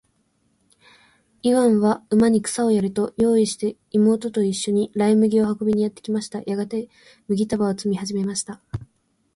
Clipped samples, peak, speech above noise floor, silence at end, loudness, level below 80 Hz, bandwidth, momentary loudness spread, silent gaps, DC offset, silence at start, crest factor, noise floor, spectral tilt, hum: under 0.1%; -6 dBFS; 46 dB; 0.5 s; -21 LUFS; -56 dBFS; 11.5 kHz; 10 LU; none; under 0.1%; 1.45 s; 14 dB; -66 dBFS; -6 dB/octave; none